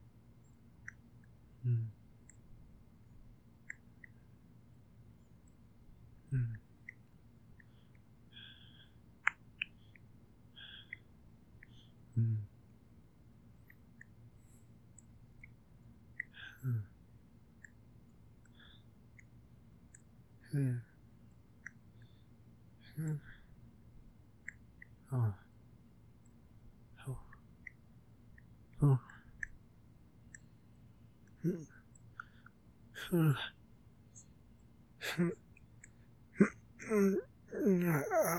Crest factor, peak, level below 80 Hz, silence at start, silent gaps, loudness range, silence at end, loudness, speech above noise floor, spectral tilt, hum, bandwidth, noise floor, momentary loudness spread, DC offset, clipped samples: 32 dB; -10 dBFS; -66 dBFS; 0.85 s; none; 16 LU; 0 s; -38 LUFS; 28 dB; -6.5 dB/octave; none; 18 kHz; -63 dBFS; 29 LU; under 0.1%; under 0.1%